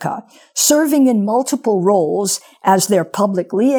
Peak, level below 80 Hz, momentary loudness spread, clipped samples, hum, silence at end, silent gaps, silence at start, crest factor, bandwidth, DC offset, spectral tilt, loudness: 0 dBFS; -68 dBFS; 7 LU; under 0.1%; none; 0 s; none; 0 s; 14 dB; over 20 kHz; under 0.1%; -4 dB/octave; -15 LUFS